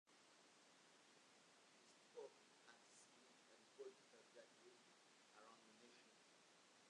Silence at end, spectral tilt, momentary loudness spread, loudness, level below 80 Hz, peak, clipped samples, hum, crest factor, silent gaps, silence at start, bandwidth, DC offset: 0 s; -2 dB/octave; 7 LU; -66 LUFS; under -90 dBFS; -48 dBFS; under 0.1%; none; 22 dB; none; 0.05 s; 10.5 kHz; under 0.1%